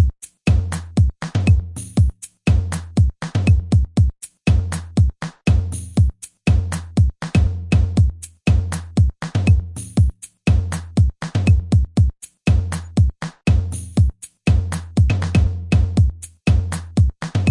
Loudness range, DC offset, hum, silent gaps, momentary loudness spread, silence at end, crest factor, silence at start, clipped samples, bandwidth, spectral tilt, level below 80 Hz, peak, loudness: 1 LU; under 0.1%; none; none; 6 LU; 0 s; 14 dB; 0 s; under 0.1%; 11.5 kHz; -7 dB/octave; -24 dBFS; -4 dBFS; -19 LUFS